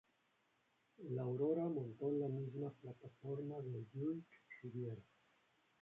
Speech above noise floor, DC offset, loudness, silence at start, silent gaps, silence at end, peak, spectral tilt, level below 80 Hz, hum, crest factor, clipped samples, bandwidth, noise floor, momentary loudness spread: 36 dB; under 0.1%; -45 LUFS; 1 s; none; 0.8 s; -28 dBFS; -10 dB/octave; -84 dBFS; none; 18 dB; under 0.1%; 3.9 kHz; -80 dBFS; 16 LU